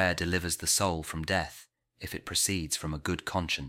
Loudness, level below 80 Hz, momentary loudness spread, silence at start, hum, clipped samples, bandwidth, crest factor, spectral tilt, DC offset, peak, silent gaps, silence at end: -30 LUFS; -48 dBFS; 13 LU; 0 s; none; under 0.1%; 17 kHz; 20 dB; -3 dB/octave; under 0.1%; -12 dBFS; none; 0 s